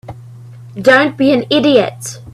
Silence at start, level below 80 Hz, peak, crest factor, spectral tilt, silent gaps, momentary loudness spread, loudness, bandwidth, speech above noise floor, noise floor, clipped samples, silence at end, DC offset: 0.05 s; -52 dBFS; 0 dBFS; 14 dB; -4.5 dB/octave; none; 19 LU; -12 LUFS; 13.5 kHz; 22 dB; -34 dBFS; under 0.1%; 0.05 s; under 0.1%